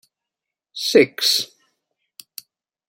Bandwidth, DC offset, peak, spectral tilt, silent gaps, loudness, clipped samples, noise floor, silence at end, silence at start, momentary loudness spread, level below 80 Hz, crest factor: 16.5 kHz; under 0.1%; -2 dBFS; -2 dB/octave; none; -17 LUFS; under 0.1%; -86 dBFS; 1.45 s; 0.75 s; 23 LU; -72 dBFS; 22 dB